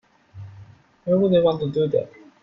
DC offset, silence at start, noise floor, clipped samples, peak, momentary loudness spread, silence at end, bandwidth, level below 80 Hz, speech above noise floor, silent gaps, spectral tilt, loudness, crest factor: under 0.1%; 0.35 s; -47 dBFS; under 0.1%; -8 dBFS; 24 LU; 0.35 s; 5.8 kHz; -56 dBFS; 28 dB; none; -9.5 dB/octave; -21 LUFS; 16 dB